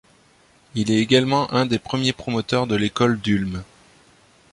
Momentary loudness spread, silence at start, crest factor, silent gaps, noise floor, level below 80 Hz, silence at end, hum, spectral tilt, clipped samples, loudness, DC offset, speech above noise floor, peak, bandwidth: 9 LU; 0.75 s; 20 dB; none; -56 dBFS; -50 dBFS; 0.9 s; none; -5.5 dB/octave; under 0.1%; -21 LUFS; under 0.1%; 35 dB; -2 dBFS; 11.5 kHz